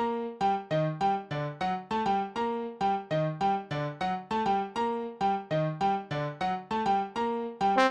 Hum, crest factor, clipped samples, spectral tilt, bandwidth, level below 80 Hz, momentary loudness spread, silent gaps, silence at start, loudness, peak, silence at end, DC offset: none; 18 dB; under 0.1%; -6.5 dB/octave; 9.6 kHz; -62 dBFS; 4 LU; none; 0 s; -30 LUFS; -12 dBFS; 0 s; under 0.1%